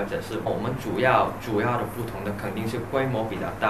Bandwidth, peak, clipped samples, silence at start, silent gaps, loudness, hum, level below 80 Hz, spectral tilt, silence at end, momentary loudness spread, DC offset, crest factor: 14 kHz; -6 dBFS; under 0.1%; 0 s; none; -26 LUFS; none; -48 dBFS; -6.5 dB/octave; 0 s; 10 LU; 0.4%; 20 dB